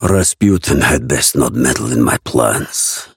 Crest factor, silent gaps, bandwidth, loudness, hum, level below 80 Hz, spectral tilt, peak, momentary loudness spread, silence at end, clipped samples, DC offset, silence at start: 14 dB; none; 17 kHz; -13 LUFS; none; -32 dBFS; -4 dB/octave; 0 dBFS; 3 LU; 0.1 s; under 0.1%; under 0.1%; 0 s